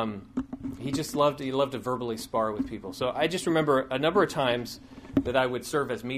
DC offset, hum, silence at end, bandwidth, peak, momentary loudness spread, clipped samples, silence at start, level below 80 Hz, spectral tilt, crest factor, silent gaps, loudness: under 0.1%; none; 0 s; 15.5 kHz; -10 dBFS; 11 LU; under 0.1%; 0 s; -54 dBFS; -5 dB/octave; 18 dB; none; -28 LUFS